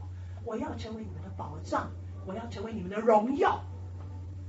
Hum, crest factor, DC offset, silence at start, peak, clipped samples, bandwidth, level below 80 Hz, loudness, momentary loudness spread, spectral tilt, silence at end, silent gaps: none; 22 dB; under 0.1%; 0 s; -12 dBFS; under 0.1%; 8 kHz; -54 dBFS; -33 LUFS; 17 LU; -6 dB/octave; 0 s; none